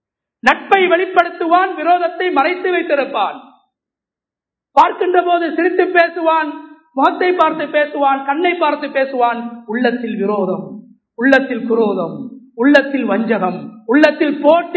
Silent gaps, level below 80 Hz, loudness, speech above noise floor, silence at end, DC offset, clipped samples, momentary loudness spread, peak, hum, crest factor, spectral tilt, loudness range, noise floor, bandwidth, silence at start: none; -62 dBFS; -15 LUFS; 72 dB; 0 s; under 0.1%; 0.1%; 9 LU; 0 dBFS; none; 16 dB; -6 dB/octave; 3 LU; -87 dBFS; 8 kHz; 0.45 s